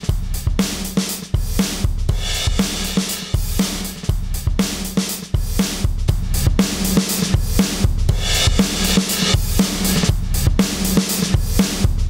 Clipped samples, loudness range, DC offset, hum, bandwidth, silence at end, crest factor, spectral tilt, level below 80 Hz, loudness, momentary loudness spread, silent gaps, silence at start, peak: under 0.1%; 4 LU; under 0.1%; none; 16.5 kHz; 0 s; 14 dB; -4 dB/octave; -22 dBFS; -19 LUFS; 6 LU; none; 0 s; -4 dBFS